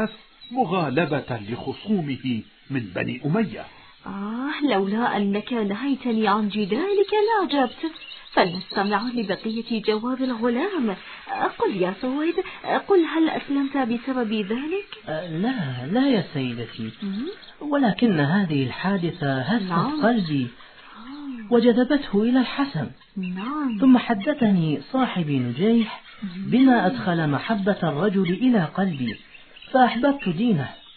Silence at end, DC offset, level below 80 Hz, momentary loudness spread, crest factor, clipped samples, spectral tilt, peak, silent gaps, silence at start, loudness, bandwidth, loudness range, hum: 0.05 s; under 0.1%; -58 dBFS; 12 LU; 18 dB; under 0.1%; -10.5 dB/octave; -6 dBFS; none; 0 s; -23 LUFS; 4.5 kHz; 4 LU; none